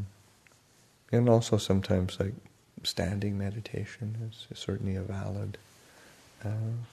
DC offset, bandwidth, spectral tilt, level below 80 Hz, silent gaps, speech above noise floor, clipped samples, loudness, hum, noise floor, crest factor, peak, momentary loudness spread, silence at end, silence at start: under 0.1%; 13.5 kHz; -6.5 dB/octave; -58 dBFS; none; 33 dB; under 0.1%; -32 LUFS; none; -63 dBFS; 24 dB; -8 dBFS; 16 LU; 0.05 s; 0 s